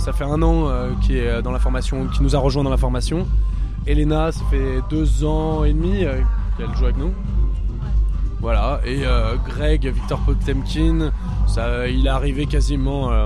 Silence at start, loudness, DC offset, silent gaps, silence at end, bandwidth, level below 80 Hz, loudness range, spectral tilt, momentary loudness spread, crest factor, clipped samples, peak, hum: 0 s; -21 LUFS; under 0.1%; none; 0 s; 10.5 kHz; -20 dBFS; 2 LU; -7 dB/octave; 4 LU; 14 dB; under 0.1%; -4 dBFS; none